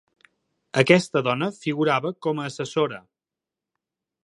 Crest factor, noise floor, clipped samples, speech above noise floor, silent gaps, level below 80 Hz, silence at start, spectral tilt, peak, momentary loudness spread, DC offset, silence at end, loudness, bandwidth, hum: 24 dB; -89 dBFS; under 0.1%; 66 dB; none; -70 dBFS; 0.75 s; -5.5 dB/octave; -2 dBFS; 10 LU; under 0.1%; 1.25 s; -23 LUFS; 11.5 kHz; none